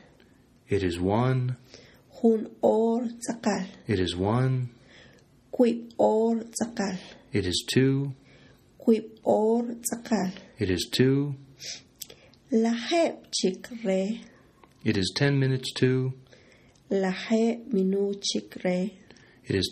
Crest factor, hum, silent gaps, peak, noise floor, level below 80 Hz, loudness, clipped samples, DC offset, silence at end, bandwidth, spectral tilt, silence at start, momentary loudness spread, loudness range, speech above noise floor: 18 dB; none; none; -10 dBFS; -58 dBFS; -60 dBFS; -27 LUFS; under 0.1%; under 0.1%; 0 s; 14 kHz; -5.5 dB/octave; 0.7 s; 11 LU; 2 LU; 32 dB